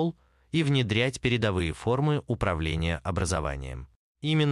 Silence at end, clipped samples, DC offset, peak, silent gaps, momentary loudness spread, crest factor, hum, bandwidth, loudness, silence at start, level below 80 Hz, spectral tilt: 0 s; under 0.1%; under 0.1%; -10 dBFS; 3.96-4.15 s; 9 LU; 16 dB; none; 11 kHz; -28 LUFS; 0 s; -44 dBFS; -5.5 dB/octave